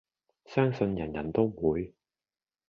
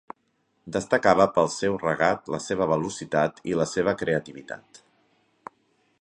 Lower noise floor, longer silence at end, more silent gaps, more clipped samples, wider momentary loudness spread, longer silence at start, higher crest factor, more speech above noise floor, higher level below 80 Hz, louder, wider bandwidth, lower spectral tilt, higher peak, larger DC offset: first, under -90 dBFS vs -71 dBFS; second, 0.8 s vs 1.25 s; neither; neither; second, 7 LU vs 12 LU; second, 0.5 s vs 0.65 s; about the same, 20 dB vs 24 dB; first, over 61 dB vs 46 dB; about the same, -54 dBFS vs -58 dBFS; second, -30 LUFS vs -24 LUFS; second, 6.8 kHz vs 11 kHz; first, -9 dB/octave vs -5 dB/octave; second, -12 dBFS vs -2 dBFS; neither